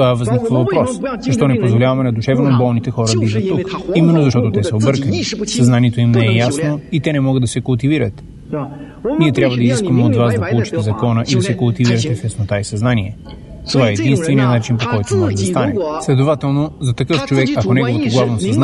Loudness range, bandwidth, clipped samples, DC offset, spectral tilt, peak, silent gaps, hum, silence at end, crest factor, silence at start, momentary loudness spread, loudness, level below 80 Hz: 2 LU; 11.5 kHz; under 0.1%; under 0.1%; -6.5 dB/octave; 0 dBFS; none; none; 0 s; 14 dB; 0 s; 7 LU; -15 LUFS; -42 dBFS